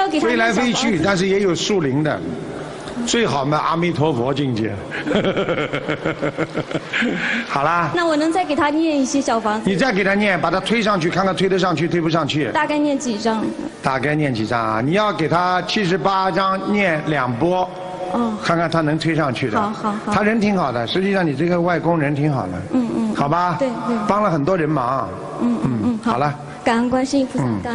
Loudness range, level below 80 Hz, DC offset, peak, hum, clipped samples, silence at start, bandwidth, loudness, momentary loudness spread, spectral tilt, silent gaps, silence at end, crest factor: 2 LU; -48 dBFS; under 0.1%; -2 dBFS; none; under 0.1%; 0 s; 11 kHz; -19 LUFS; 6 LU; -5.5 dB/octave; none; 0 s; 16 dB